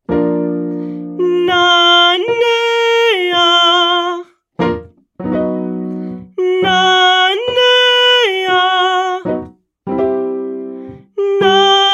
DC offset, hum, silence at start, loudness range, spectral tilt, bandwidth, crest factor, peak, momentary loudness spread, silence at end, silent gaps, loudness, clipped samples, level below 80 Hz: under 0.1%; none; 0.1 s; 5 LU; -3.5 dB/octave; 13 kHz; 14 dB; 0 dBFS; 16 LU; 0 s; none; -12 LUFS; under 0.1%; -50 dBFS